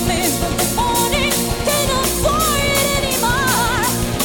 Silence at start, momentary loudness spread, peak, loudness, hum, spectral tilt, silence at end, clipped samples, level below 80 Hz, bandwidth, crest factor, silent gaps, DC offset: 0 s; 2 LU; -2 dBFS; -16 LUFS; none; -3 dB/octave; 0 s; under 0.1%; -28 dBFS; 19.5 kHz; 16 dB; none; under 0.1%